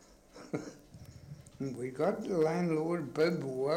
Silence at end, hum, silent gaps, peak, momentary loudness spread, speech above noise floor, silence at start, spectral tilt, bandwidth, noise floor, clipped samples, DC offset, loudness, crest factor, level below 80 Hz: 0 s; none; none; -16 dBFS; 22 LU; 22 dB; 0.35 s; -7 dB/octave; 16 kHz; -55 dBFS; under 0.1%; under 0.1%; -34 LUFS; 18 dB; -66 dBFS